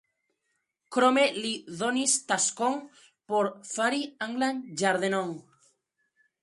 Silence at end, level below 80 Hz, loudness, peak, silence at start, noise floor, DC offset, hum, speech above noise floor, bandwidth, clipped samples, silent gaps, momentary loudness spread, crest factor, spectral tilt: 1 s; -78 dBFS; -27 LUFS; -10 dBFS; 0.9 s; -79 dBFS; under 0.1%; none; 51 dB; 11.5 kHz; under 0.1%; none; 9 LU; 20 dB; -2.5 dB/octave